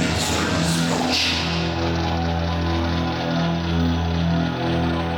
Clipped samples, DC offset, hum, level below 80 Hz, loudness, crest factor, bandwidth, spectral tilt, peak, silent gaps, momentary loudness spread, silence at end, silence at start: under 0.1%; under 0.1%; none; -34 dBFS; -21 LUFS; 12 dB; 17 kHz; -5 dB/octave; -8 dBFS; none; 4 LU; 0 s; 0 s